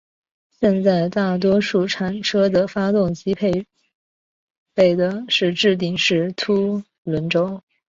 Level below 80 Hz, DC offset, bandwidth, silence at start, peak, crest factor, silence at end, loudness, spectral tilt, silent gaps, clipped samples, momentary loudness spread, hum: -54 dBFS; under 0.1%; 7.6 kHz; 0.6 s; -4 dBFS; 16 dB; 0.35 s; -19 LUFS; -5.5 dB/octave; 3.95-4.66 s, 6.98-7.05 s; under 0.1%; 8 LU; none